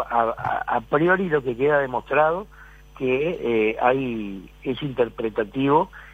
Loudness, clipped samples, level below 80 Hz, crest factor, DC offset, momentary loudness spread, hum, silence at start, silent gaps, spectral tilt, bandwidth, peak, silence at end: -23 LUFS; under 0.1%; -48 dBFS; 18 dB; under 0.1%; 10 LU; none; 0 s; none; -8 dB/octave; 13.5 kHz; -4 dBFS; 0 s